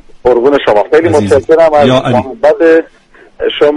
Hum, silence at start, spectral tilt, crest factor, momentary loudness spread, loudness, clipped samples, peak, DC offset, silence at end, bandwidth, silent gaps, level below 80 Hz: none; 0.15 s; -6 dB/octave; 8 dB; 5 LU; -8 LUFS; 0.3%; 0 dBFS; under 0.1%; 0 s; 11.5 kHz; none; -38 dBFS